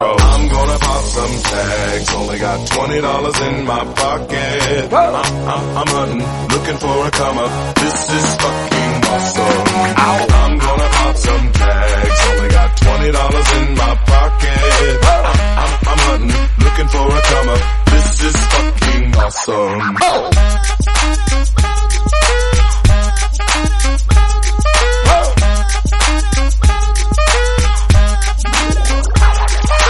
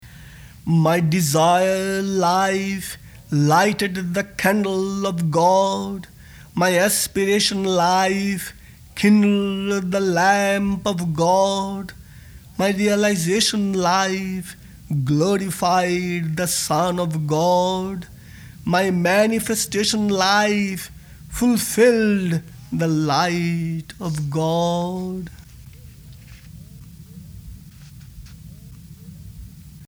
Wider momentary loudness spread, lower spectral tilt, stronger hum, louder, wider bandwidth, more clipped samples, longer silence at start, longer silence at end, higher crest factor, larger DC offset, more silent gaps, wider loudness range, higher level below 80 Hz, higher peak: second, 5 LU vs 15 LU; about the same, -4.5 dB/octave vs -4.5 dB/octave; neither; first, -13 LUFS vs -19 LUFS; second, 12 kHz vs over 20 kHz; neither; about the same, 0 s vs 0.05 s; about the same, 0 s vs 0 s; about the same, 12 dB vs 16 dB; neither; neither; about the same, 3 LU vs 4 LU; first, -14 dBFS vs -48 dBFS; first, 0 dBFS vs -4 dBFS